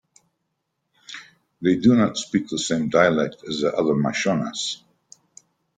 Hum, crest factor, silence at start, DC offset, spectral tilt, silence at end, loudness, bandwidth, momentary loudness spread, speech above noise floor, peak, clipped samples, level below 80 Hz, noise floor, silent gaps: none; 20 dB; 1.1 s; under 0.1%; -5 dB/octave; 1 s; -21 LUFS; 9.4 kHz; 19 LU; 56 dB; -4 dBFS; under 0.1%; -60 dBFS; -76 dBFS; none